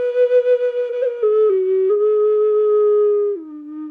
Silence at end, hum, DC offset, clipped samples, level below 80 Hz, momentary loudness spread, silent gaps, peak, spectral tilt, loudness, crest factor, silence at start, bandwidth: 0 s; none; under 0.1%; under 0.1%; -76 dBFS; 7 LU; none; -6 dBFS; -5.5 dB/octave; -16 LUFS; 10 dB; 0 s; 3.7 kHz